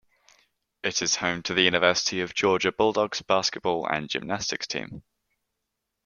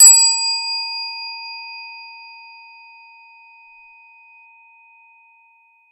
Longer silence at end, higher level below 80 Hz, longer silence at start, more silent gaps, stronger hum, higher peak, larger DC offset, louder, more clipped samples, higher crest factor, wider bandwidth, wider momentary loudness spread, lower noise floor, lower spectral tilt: second, 1.05 s vs 3.75 s; first, -62 dBFS vs -90 dBFS; first, 0.85 s vs 0 s; neither; neither; second, -4 dBFS vs 0 dBFS; neither; second, -25 LUFS vs -15 LUFS; neither; about the same, 24 dB vs 20 dB; second, 10 kHz vs 15.5 kHz; second, 9 LU vs 28 LU; first, -82 dBFS vs -55 dBFS; first, -2.5 dB/octave vs 10.5 dB/octave